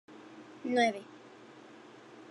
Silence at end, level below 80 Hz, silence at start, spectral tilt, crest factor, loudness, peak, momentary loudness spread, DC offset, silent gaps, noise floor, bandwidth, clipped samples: 0.05 s; under -90 dBFS; 0.1 s; -4 dB/octave; 22 dB; -32 LUFS; -16 dBFS; 24 LU; under 0.1%; none; -54 dBFS; 11.5 kHz; under 0.1%